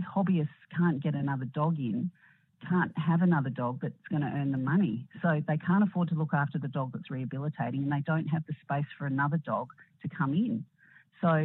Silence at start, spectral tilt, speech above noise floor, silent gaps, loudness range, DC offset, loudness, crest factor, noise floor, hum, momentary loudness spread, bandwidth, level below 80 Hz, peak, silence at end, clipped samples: 0 s; -11.5 dB/octave; 30 dB; none; 3 LU; under 0.1%; -31 LUFS; 16 dB; -60 dBFS; none; 9 LU; 4 kHz; -74 dBFS; -14 dBFS; 0 s; under 0.1%